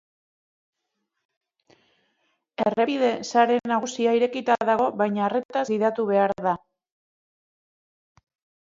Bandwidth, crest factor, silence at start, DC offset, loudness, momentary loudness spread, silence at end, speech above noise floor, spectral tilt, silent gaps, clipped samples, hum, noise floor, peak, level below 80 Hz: 7.8 kHz; 20 dB; 2.6 s; under 0.1%; -23 LUFS; 6 LU; 2.1 s; 57 dB; -5 dB/octave; 5.45-5.49 s; under 0.1%; none; -79 dBFS; -6 dBFS; -70 dBFS